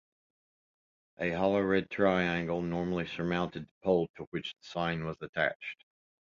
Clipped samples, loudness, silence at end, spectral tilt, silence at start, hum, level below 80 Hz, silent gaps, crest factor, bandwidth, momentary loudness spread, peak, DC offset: under 0.1%; -32 LUFS; 0.65 s; -7 dB/octave; 1.2 s; none; -60 dBFS; 3.71-3.81 s, 4.09-4.14 s, 4.27-4.32 s, 5.29-5.33 s, 5.55-5.60 s; 20 dB; 7.2 kHz; 11 LU; -14 dBFS; under 0.1%